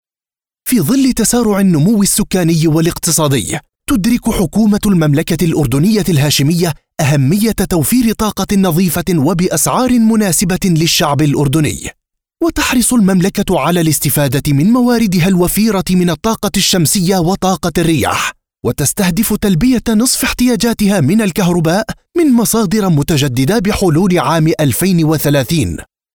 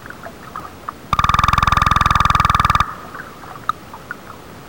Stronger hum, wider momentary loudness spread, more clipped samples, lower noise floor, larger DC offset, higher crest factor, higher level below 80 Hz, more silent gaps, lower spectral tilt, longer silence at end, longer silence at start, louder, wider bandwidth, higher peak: neither; second, 5 LU vs 19 LU; neither; first, under -90 dBFS vs -36 dBFS; about the same, 0.5% vs 0.4%; about the same, 10 dB vs 14 dB; about the same, -34 dBFS vs -30 dBFS; neither; about the same, -5 dB/octave vs -4 dB/octave; first, 0.3 s vs 0 s; first, 0.65 s vs 0 s; first, -12 LUFS vs -16 LUFS; about the same, over 20 kHz vs over 20 kHz; first, -2 dBFS vs -6 dBFS